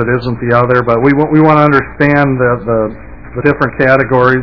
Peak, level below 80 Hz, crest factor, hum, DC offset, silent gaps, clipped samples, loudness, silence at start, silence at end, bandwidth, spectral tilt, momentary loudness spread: 0 dBFS; -34 dBFS; 10 dB; none; 0.9%; none; 1%; -10 LUFS; 0 s; 0 s; 5.4 kHz; -9.5 dB/octave; 7 LU